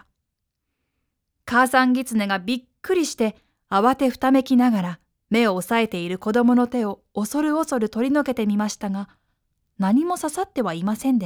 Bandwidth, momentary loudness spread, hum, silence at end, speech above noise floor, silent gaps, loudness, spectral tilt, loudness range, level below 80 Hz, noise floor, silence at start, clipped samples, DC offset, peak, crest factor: 18.5 kHz; 10 LU; none; 0 s; 58 dB; none; -22 LUFS; -5 dB/octave; 3 LU; -60 dBFS; -79 dBFS; 1.45 s; under 0.1%; under 0.1%; -6 dBFS; 16 dB